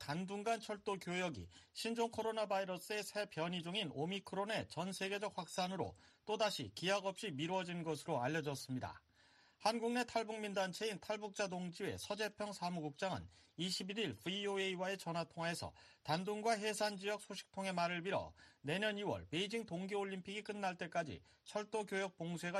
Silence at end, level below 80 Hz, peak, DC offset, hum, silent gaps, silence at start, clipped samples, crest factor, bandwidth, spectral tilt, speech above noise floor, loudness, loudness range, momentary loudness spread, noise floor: 0 s; -76 dBFS; -22 dBFS; under 0.1%; none; none; 0 s; under 0.1%; 20 dB; 13 kHz; -4 dB/octave; 28 dB; -42 LUFS; 2 LU; 7 LU; -70 dBFS